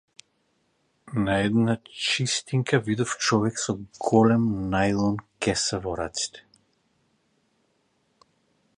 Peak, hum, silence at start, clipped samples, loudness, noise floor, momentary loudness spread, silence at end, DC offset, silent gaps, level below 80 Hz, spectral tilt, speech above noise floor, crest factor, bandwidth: -4 dBFS; none; 1.05 s; under 0.1%; -25 LUFS; -70 dBFS; 9 LU; 2.35 s; under 0.1%; none; -52 dBFS; -4.5 dB/octave; 46 dB; 22 dB; 10.5 kHz